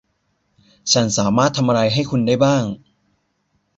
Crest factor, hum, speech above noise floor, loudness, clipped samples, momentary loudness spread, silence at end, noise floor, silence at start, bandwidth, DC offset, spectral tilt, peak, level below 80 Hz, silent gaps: 18 dB; none; 51 dB; -17 LUFS; under 0.1%; 10 LU; 1 s; -67 dBFS; 0.85 s; 8.2 kHz; under 0.1%; -4.5 dB/octave; -2 dBFS; -52 dBFS; none